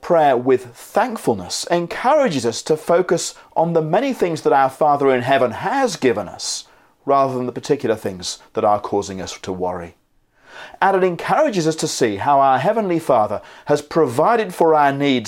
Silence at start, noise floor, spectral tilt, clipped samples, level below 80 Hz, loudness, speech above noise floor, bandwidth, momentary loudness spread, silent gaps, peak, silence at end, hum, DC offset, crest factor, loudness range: 0 s; -55 dBFS; -4.5 dB/octave; under 0.1%; -60 dBFS; -18 LUFS; 37 dB; 16.5 kHz; 10 LU; none; -2 dBFS; 0 s; none; under 0.1%; 16 dB; 4 LU